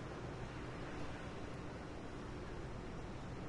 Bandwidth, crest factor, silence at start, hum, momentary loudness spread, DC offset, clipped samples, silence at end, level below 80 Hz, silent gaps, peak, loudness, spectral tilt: 11 kHz; 12 dB; 0 s; none; 2 LU; under 0.1%; under 0.1%; 0 s; -56 dBFS; none; -34 dBFS; -48 LUFS; -6 dB/octave